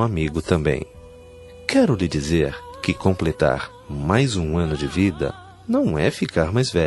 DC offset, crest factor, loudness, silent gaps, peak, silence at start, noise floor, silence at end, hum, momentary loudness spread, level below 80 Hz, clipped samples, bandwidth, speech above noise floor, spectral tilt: under 0.1%; 20 dB; -22 LUFS; none; -2 dBFS; 0 s; -42 dBFS; 0 s; none; 9 LU; -40 dBFS; under 0.1%; 12 kHz; 22 dB; -6 dB/octave